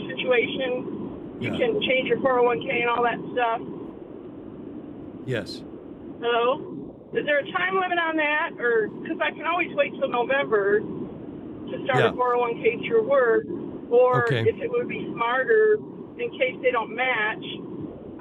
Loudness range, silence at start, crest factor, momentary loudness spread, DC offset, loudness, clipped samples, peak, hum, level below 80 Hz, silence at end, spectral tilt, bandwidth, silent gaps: 6 LU; 0 s; 18 dB; 17 LU; under 0.1%; -24 LUFS; under 0.1%; -8 dBFS; none; -62 dBFS; 0 s; -6.5 dB/octave; 8.8 kHz; none